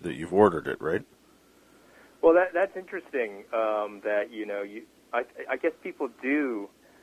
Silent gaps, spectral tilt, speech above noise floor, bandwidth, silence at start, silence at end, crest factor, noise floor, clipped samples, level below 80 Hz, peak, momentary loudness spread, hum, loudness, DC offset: none; -7 dB/octave; 32 dB; 14.5 kHz; 0 s; 0.35 s; 22 dB; -59 dBFS; under 0.1%; -64 dBFS; -6 dBFS; 13 LU; none; -28 LUFS; under 0.1%